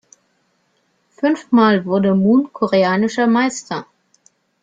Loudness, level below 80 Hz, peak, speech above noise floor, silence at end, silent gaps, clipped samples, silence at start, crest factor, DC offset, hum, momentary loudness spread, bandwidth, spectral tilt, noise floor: -16 LUFS; -62 dBFS; -2 dBFS; 49 dB; 0.8 s; none; under 0.1%; 1.2 s; 14 dB; under 0.1%; none; 9 LU; 9 kHz; -6 dB/octave; -64 dBFS